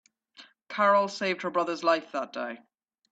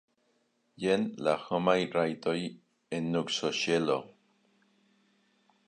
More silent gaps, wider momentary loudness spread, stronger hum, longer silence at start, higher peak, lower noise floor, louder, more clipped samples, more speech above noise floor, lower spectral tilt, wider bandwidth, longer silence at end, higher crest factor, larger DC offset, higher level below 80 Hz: neither; first, 15 LU vs 8 LU; neither; second, 0.4 s vs 0.8 s; about the same, -10 dBFS vs -12 dBFS; second, -56 dBFS vs -73 dBFS; first, -27 LUFS vs -31 LUFS; neither; second, 29 dB vs 43 dB; about the same, -4.5 dB/octave vs -5 dB/octave; second, 8 kHz vs 10 kHz; second, 0.55 s vs 1.6 s; about the same, 18 dB vs 22 dB; neither; second, -80 dBFS vs -70 dBFS